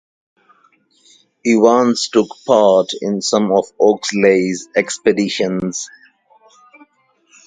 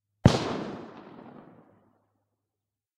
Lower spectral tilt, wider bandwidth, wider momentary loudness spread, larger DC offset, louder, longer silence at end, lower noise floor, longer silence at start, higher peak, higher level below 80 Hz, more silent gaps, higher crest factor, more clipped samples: second, -4.5 dB/octave vs -6.5 dB/octave; second, 9.6 kHz vs 12 kHz; second, 9 LU vs 25 LU; neither; first, -15 LUFS vs -27 LUFS; about the same, 1.6 s vs 1.7 s; second, -57 dBFS vs -88 dBFS; first, 1.45 s vs 0.25 s; first, 0 dBFS vs -6 dBFS; second, -60 dBFS vs -48 dBFS; neither; second, 16 dB vs 26 dB; neither